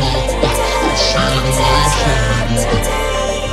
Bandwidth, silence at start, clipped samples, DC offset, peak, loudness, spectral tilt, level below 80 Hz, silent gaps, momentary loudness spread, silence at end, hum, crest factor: 15.5 kHz; 0 s; under 0.1%; under 0.1%; 0 dBFS; -14 LUFS; -4 dB/octave; -20 dBFS; none; 4 LU; 0 s; none; 14 dB